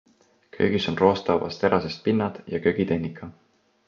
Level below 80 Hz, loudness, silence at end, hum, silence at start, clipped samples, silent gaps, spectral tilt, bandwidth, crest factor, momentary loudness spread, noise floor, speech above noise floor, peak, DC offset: -52 dBFS; -24 LUFS; 0.55 s; none; 0.55 s; under 0.1%; none; -7 dB/octave; 7.2 kHz; 22 dB; 8 LU; -53 dBFS; 29 dB; -4 dBFS; under 0.1%